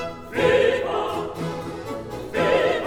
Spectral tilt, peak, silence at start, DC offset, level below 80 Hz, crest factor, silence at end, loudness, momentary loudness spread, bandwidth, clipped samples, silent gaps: -5.5 dB/octave; -6 dBFS; 0 s; under 0.1%; -48 dBFS; 16 dB; 0 s; -23 LUFS; 13 LU; 16 kHz; under 0.1%; none